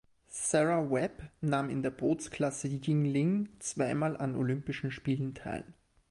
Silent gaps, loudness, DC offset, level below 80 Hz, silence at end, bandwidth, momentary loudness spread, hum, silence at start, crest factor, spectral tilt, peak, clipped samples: none; -33 LUFS; under 0.1%; -62 dBFS; 0.4 s; 11.5 kHz; 9 LU; none; 0.3 s; 18 dB; -6 dB/octave; -14 dBFS; under 0.1%